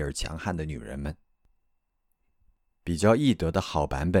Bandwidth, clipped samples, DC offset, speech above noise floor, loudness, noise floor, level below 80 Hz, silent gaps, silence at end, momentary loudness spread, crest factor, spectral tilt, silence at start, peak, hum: 16 kHz; under 0.1%; under 0.1%; 47 dB; -27 LUFS; -74 dBFS; -42 dBFS; none; 0 s; 14 LU; 20 dB; -6 dB/octave; 0 s; -8 dBFS; none